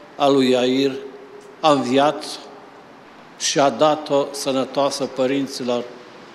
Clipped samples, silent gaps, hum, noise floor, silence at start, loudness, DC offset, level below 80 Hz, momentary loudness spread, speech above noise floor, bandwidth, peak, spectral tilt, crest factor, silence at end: under 0.1%; none; none; -43 dBFS; 0 s; -19 LUFS; under 0.1%; -68 dBFS; 18 LU; 25 dB; 13.5 kHz; -2 dBFS; -4 dB/octave; 20 dB; 0 s